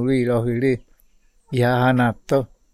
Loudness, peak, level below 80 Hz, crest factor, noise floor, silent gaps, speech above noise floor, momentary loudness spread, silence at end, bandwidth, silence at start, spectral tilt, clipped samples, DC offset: -20 LUFS; -6 dBFS; -48 dBFS; 16 dB; -56 dBFS; none; 37 dB; 6 LU; 0.3 s; 14 kHz; 0 s; -7.5 dB/octave; under 0.1%; under 0.1%